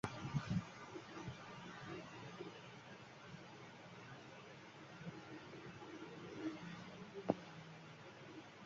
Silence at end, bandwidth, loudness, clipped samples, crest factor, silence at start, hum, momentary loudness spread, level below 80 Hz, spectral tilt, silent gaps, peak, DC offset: 0 s; 7.4 kHz; -51 LUFS; under 0.1%; 32 dB; 0.05 s; none; 13 LU; -72 dBFS; -5.5 dB/octave; none; -18 dBFS; under 0.1%